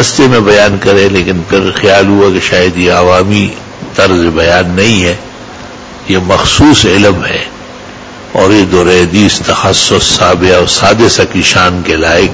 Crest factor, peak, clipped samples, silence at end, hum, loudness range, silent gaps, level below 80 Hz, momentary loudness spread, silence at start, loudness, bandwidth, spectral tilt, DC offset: 8 dB; 0 dBFS; 3%; 0 s; none; 3 LU; none; -26 dBFS; 16 LU; 0 s; -7 LUFS; 8 kHz; -4 dB/octave; under 0.1%